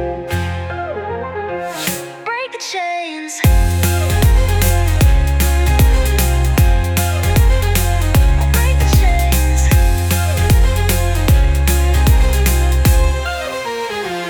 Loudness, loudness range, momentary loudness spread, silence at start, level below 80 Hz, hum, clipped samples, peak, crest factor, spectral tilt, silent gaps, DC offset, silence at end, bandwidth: -15 LUFS; 4 LU; 9 LU; 0 s; -16 dBFS; none; under 0.1%; 0 dBFS; 12 dB; -5 dB/octave; none; under 0.1%; 0 s; over 20 kHz